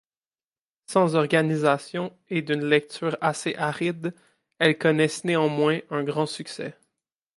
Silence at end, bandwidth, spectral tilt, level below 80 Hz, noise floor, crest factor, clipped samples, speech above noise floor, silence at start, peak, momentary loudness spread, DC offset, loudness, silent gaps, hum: 0.65 s; 11.5 kHz; -5.5 dB/octave; -74 dBFS; under -90 dBFS; 20 dB; under 0.1%; over 66 dB; 0.9 s; -4 dBFS; 11 LU; under 0.1%; -24 LUFS; none; none